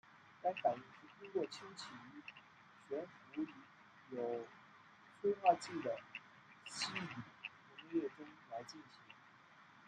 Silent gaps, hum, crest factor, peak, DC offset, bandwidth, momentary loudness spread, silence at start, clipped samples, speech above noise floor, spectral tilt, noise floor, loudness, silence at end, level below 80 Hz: none; none; 26 dB; -20 dBFS; under 0.1%; 10 kHz; 24 LU; 0.05 s; under 0.1%; 22 dB; -4 dB/octave; -64 dBFS; -43 LUFS; 0 s; -88 dBFS